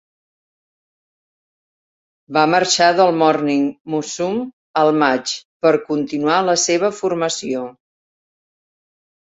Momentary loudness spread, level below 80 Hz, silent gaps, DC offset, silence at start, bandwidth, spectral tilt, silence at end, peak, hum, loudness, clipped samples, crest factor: 10 LU; -64 dBFS; 3.81-3.85 s, 4.53-4.74 s, 5.45-5.60 s; under 0.1%; 2.3 s; 8.2 kHz; -3.5 dB/octave; 1.55 s; 0 dBFS; none; -17 LUFS; under 0.1%; 18 dB